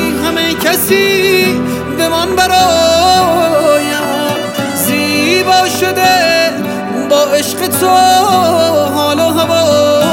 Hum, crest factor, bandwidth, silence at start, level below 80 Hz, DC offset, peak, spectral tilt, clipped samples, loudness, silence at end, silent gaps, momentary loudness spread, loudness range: none; 10 dB; 16.5 kHz; 0 s; -42 dBFS; under 0.1%; 0 dBFS; -3.5 dB/octave; under 0.1%; -10 LUFS; 0 s; none; 6 LU; 1 LU